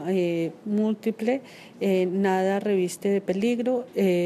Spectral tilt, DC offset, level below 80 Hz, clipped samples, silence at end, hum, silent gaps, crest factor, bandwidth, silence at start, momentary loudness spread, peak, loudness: -6.5 dB/octave; under 0.1%; -74 dBFS; under 0.1%; 0 s; none; none; 14 dB; 14 kHz; 0 s; 5 LU; -12 dBFS; -25 LUFS